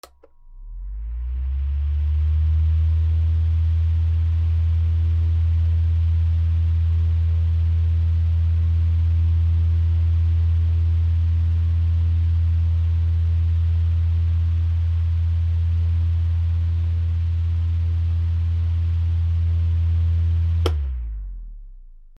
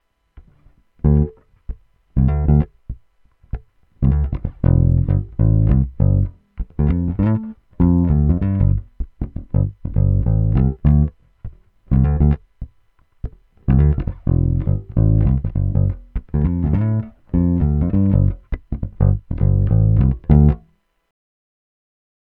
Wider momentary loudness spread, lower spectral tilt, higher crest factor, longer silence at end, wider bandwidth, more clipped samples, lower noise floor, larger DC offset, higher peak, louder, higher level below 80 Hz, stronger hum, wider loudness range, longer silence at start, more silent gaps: second, 3 LU vs 19 LU; second, -8.5 dB/octave vs -13.5 dB/octave; about the same, 14 dB vs 18 dB; second, 0.1 s vs 1.7 s; first, 3.7 kHz vs 3 kHz; neither; second, -47 dBFS vs -56 dBFS; neither; second, -6 dBFS vs 0 dBFS; second, -21 LUFS vs -18 LUFS; about the same, -28 dBFS vs -24 dBFS; neither; about the same, 2 LU vs 3 LU; about the same, 0.45 s vs 0.35 s; neither